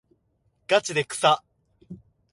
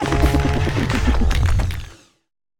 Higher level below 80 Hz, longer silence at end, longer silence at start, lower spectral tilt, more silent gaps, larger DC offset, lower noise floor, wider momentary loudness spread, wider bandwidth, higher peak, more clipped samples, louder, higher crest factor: second, -66 dBFS vs -22 dBFS; second, 0.35 s vs 0.65 s; first, 0.7 s vs 0 s; second, -2.5 dB/octave vs -6 dB/octave; neither; neither; first, -69 dBFS vs -39 dBFS; second, 5 LU vs 10 LU; second, 11.5 kHz vs 17 kHz; second, -6 dBFS vs -2 dBFS; neither; second, -23 LUFS vs -20 LUFS; first, 22 dB vs 16 dB